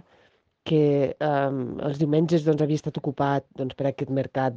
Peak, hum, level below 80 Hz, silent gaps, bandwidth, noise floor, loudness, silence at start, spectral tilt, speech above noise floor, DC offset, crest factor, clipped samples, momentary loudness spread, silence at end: -8 dBFS; none; -62 dBFS; none; 7.6 kHz; -63 dBFS; -25 LUFS; 0.65 s; -8 dB/octave; 39 dB; under 0.1%; 16 dB; under 0.1%; 8 LU; 0 s